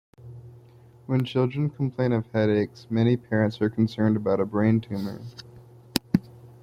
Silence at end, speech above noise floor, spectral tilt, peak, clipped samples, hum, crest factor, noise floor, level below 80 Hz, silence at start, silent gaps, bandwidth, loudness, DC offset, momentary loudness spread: 0.15 s; 27 dB; -7.5 dB/octave; 0 dBFS; under 0.1%; none; 24 dB; -51 dBFS; -58 dBFS; 0.25 s; none; 16 kHz; -25 LUFS; under 0.1%; 20 LU